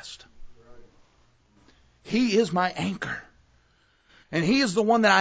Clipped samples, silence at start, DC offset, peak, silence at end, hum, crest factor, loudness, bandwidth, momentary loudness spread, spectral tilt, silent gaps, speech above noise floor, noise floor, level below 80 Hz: under 0.1%; 0.05 s; under 0.1%; -6 dBFS; 0 s; none; 20 dB; -24 LUFS; 8 kHz; 15 LU; -5 dB/octave; none; 41 dB; -64 dBFS; -58 dBFS